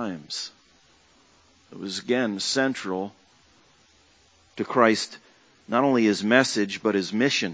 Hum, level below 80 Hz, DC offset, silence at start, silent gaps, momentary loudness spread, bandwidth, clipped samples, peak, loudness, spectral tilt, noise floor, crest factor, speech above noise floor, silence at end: none; -68 dBFS; under 0.1%; 0 s; none; 14 LU; 8 kHz; under 0.1%; -2 dBFS; -24 LUFS; -4 dB/octave; -59 dBFS; 24 dB; 35 dB; 0 s